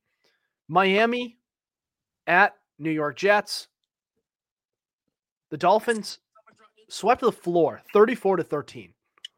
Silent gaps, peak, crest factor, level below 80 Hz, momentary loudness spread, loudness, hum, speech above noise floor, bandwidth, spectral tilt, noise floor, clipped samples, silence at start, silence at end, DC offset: 4.51-4.57 s, 4.93-4.99 s, 5.32-5.41 s; -4 dBFS; 22 dB; -70 dBFS; 16 LU; -23 LUFS; none; over 67 dB; 16.5 kHz; -4.5 dB/octave; under -90 dBFS; under 0.1%; 0.7 s; 0.55 s; under 0.1%